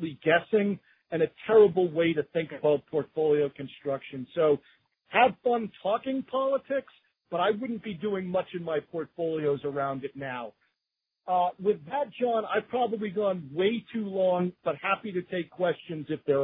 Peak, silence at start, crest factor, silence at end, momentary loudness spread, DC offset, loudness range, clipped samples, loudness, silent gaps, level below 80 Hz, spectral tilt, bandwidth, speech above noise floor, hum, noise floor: -8 dBFS; 0 s; 20 dB; 0 s; 11 LU; under 0.1%; 5 LU; under 0.1%; -28 LUFS; none; -72 dBFS; -10 dB/octave; 4 kHz; 58 dB; none; -86 dBFS